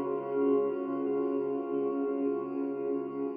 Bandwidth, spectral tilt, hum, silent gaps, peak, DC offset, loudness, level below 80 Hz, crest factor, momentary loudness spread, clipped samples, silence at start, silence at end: 3.2 kHz; -8 dB/octave; none; none; -18 dBFS; under 0.1%; -32 LUFS; under -90 dBFS; 14 dB; 5 LU; under 0.1%; 0 s; 0 s